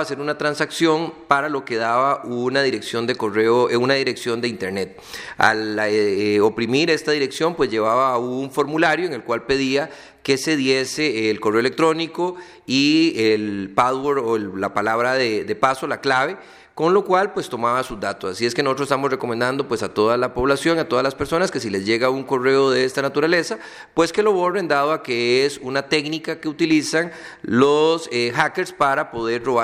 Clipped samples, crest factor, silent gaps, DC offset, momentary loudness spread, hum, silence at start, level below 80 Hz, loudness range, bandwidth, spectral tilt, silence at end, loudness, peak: under 0.1%; 20 dB; none; under 0.1%; 7 LU; none; 0 s; -54 dBFS; 2 LU; 15 kHz; -4.5 dB/octave; 0 s; -20 LUFS; 0 dBFS